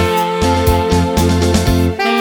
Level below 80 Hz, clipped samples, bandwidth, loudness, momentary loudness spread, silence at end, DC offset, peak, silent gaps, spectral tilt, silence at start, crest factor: -24 dBFS; under 0.1%; 19.5 kHz; -14 LUFS; 2 LU; 0 s; under 0.1%; 0 dBFS; none; -5.5 dB/octave; 0 s; 12 dB